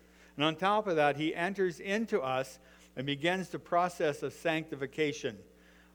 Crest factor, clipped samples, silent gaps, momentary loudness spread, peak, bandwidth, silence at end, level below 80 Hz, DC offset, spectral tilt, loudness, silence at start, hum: 20 dB; under 0.1%; none; 11 LU; -14 dBFS; over 20 kHz; 0.55 s; -68 dBFS; under 0.1%; -5 dB/octave; -32 LUFS; 0.35 s; none